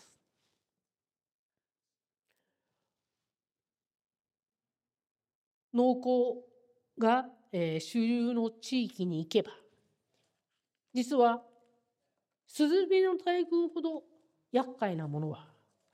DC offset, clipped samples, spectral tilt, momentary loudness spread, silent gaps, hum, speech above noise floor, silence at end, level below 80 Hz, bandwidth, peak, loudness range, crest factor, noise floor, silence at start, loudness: under 0.1%; under 0.1%; -6 dB/octave; 11 LU; none; none; over 60 dB; 0.5 s; -88 dBFS; 14.5 kHz; -14 dBFS; 4 LU; 20 dB; under -90 dBFS; 5.75 s; -31 LUFS